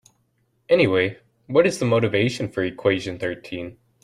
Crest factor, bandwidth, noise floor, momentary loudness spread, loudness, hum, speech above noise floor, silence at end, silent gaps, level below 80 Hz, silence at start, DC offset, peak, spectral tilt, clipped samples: 18 dB; 13 kHz; -67 dBFS; 13 LU; -21 LUFS; none; 46 dB; 0.3 s; none; -58 dBFS; 0.7 s; under 0.1%; -4 dBFS; -6 dB/octave; under 0.1%